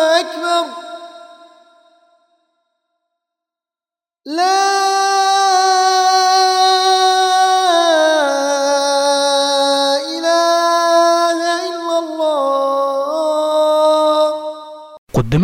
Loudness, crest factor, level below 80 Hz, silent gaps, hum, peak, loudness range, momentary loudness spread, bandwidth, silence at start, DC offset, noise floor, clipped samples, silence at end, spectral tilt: -14 LUFS; 14 dB; -46 dBFS; 14.98-15.07 s; none; 0 dBFS; 9 LU; 8 LU; 17 kHz; 0 s; under 0.1%; under -90 dBFS; under 0.1%; 0 s; -3 dB/octave